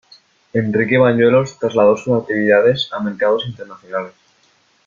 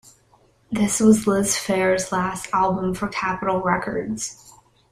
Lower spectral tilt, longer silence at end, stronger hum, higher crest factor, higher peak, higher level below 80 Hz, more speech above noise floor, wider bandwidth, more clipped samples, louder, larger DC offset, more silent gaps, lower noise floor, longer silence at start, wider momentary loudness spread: first, -6.5 dB/octave vs -4.5 dB/octave; first, 0.8 s vs 0.4 s; neither; about the same, 16 dB vs 18 dB; about the same, -2 dBFS vs -4 dBFS; about the same, -56 dBFS vs -52 dBFS; first, 42 dB vs 37 dB; second, 7.2 kHz vs 15.5 kHz; neither; first, -16 LUFS vs -21 LUFS; neither; neither; about the same, -57 dBFS vs -58 dBFS; second, 0.55 s vs 0.7 s; about the same, 13 LU vs 11 LU